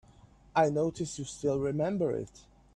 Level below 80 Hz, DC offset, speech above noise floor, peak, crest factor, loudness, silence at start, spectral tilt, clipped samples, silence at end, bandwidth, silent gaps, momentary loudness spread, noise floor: -60 dBFS; under 0.1%; 28 dB; -12 dBFS; 20 dB; -31 LUFS; 0.55 s; -6 dB/octave; under 0.1%; 0.35 s; 11.5 kHz; none; 9 LU; -58 dBFS